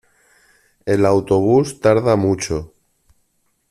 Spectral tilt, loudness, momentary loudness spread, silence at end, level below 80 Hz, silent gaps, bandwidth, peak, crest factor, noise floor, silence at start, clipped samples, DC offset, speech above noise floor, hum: -6.5 dB/octave; -17 LUFS; 10 LU; 1.05 s; -48 dBFS; none; 13 kHz; -2 dBFS; 16 dB; -65 dBFS; 0.85 s; under 0.1%; under 0.1%; 50 dB; none